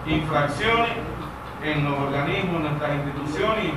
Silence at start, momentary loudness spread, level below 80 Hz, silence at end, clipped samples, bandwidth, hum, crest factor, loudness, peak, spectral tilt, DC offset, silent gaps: 0 s; 9 LU; -42 dBFS; 0 s; under 0.1%; 14 kHz; none; 16 dB; -24 LUFS; -8 dBFS; -6.5 dB/octave; 0.2%; none